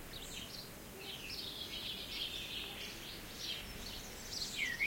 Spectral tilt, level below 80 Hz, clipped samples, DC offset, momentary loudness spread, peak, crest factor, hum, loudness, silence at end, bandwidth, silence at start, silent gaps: -1.5 dB/octave; -58 dBFS; under 0.1%; under 0.1%; 6 LU; -24 dBFS; 20 dB; none; -43 LUFS; 0 s; 16.5 kHz; 0 s; none